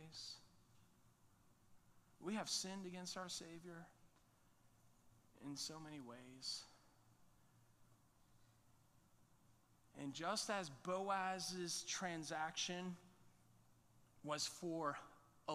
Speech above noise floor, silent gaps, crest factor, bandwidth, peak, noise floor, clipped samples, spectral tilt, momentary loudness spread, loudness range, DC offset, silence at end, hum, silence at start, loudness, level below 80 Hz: 27 dB; none; 22 dB; 15 kHz; -30 dBFS; -74 dBFS; under 0.1%; -2.5 dB/octave; 16 LU; 11 LU; under 0.1%; 0 s; none; 0 s; -46 LUFS; -82 dBFS